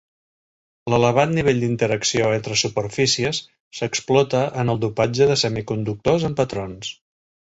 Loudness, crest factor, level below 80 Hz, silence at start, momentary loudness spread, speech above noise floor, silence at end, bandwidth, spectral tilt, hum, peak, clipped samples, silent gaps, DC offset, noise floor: -20 LUFS; 18 dB; -50 dBFS; 0.85 s; 11 LU; over 70 dB; 0.55 s; 8 kHz; -4.5 dB/octave; none; -2 dBFS; under 0.1%; 3.60-3.71 s; under 0.1%; under -90 dBFS